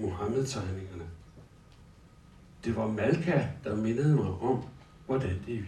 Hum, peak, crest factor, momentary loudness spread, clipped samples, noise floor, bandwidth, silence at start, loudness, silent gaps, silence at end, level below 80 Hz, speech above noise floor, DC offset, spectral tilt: none; -12 dBFS; 18 dB; 18 LU; under 0.1%; -55 dBFS; 11.5 kHz; 0 s; -31 LUFS; none; 0 s; -58 dBFS; 25 dB; under 0.1%; -7 dB/octave